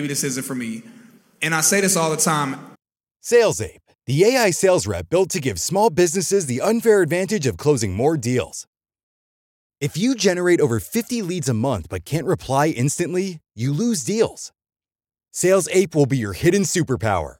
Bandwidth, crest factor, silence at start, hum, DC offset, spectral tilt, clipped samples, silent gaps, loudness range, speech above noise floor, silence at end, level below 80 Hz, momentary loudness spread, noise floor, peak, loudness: 17 kHz; 16 dB; 0 s; none; under 0.1%; -4.5 dB/octave; under 0.1%; 8.67-8.73 s, 9.03-9.70 s; 4 LU; over 71 dB; 0.1 s; -50 dBFS; 11 LU; under -90 dBFS; -4 dBFS; -20 LUFS